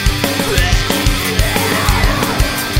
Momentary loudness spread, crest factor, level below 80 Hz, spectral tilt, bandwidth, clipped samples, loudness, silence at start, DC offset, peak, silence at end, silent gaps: 2 LU; 14 dB; -18 dBFS; -4 dB/octave; 16.5 kHz; under 0.1%; -14 LUFS; 0 s; under 0.1%; 0 dBFS; 0 s; none